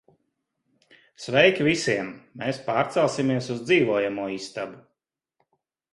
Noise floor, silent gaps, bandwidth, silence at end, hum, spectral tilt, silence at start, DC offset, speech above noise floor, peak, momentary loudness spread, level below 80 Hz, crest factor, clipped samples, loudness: -82 dBFS; none; 11.5 kHz; 1.15 s; none; -5 dB/octave; 1.2 s; under 0.1%; 58 dB; -4 dBFS; 15 LU; -64 dBFS; 22 dB; under 0.1%; -23 LUFS